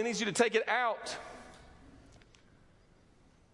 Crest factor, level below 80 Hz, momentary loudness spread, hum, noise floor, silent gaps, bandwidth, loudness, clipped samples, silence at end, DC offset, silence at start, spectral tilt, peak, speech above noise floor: 22 dB; -66 dBFS; 22 LU; none; -63 dBFS; none; 11.5 kHz; -31 LUFS; under 0.1%; 1.6 s; under 0.1%; 0 s; -3 dB/octave; -14 dBFS; 31 dB